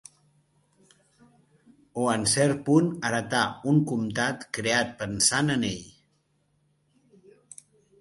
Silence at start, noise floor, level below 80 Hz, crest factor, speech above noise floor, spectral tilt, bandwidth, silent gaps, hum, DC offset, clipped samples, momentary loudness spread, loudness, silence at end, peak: 1.95 s; -70 dBFS; -60 dBFS; 22 dB; 45 dB; -4 dB/octave; 12 kHz; none; none; under 0.1%; under 0.1%; 9 LU; -25 LUFS; 2.1 s; -6 dBFS